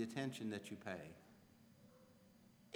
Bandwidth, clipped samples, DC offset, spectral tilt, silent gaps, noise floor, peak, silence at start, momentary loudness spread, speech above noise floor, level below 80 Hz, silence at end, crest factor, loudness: over 20 kHz; under 0.1%; under 0.1%; -5.5 dB/octave; none; -68 dBFS; -28 dBFS; 0 s; 23 LU; 21 dB; -84 dBFS; 0 s; 22 dB; -48 LUFS